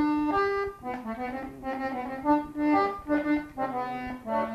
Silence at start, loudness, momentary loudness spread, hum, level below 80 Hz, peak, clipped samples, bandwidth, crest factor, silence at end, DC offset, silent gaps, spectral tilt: 0 s; -29 LUFS; 10 LU; none; -54 dBFS; -12 dBFS; under 0.1%; 13 kHz; 16 dB; 0 s; under 0.1%; none; -7 dB/octave